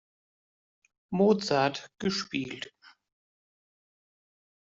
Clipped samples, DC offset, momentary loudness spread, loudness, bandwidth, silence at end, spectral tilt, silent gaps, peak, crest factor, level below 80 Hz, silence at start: under 0.1%; under 0.1%; 14 LU; -28 LUFS; 7.8 kHz; 2 s; -5 dB/octave; none; -12 dBFS; 20 dB; -68 dBFS; 1.1 s